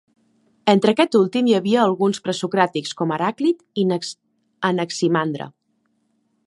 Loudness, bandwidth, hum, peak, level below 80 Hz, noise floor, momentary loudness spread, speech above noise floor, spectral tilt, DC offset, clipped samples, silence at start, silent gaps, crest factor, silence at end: -20 LUFS; 11.5 kHz; none; -2 dBFS; -70 dBFS; -68 dBFS; 9 LU; 49 dB; -5.5 dB/octave; under 0.1%; under 0.1%; 0.65 s; none; 20 dB; 0.95 s